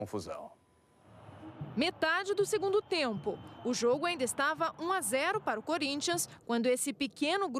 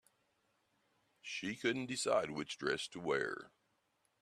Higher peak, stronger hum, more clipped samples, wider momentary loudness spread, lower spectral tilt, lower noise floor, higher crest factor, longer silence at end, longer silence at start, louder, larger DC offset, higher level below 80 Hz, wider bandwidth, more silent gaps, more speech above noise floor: first, -16 dBFS vs -20 dBFS; neither; neither; about the same, 10 LU vs 9 LU; about the same, -3 dB/octave vs -3.5 dB/octave; second, -64 dBFS vs -80 dBFS; about the same, 18 dB vs 22 dB; second, 0 s vs 0.75 s; second, 0 s vs 1.25 s; first, -32 LUFS vs -38 LUFS; neither; first, -72 dBFS vs -78 dBFS; about the same, 14.5 kHz vs 14 kHz; neither; second, 31 dB vs 41 dB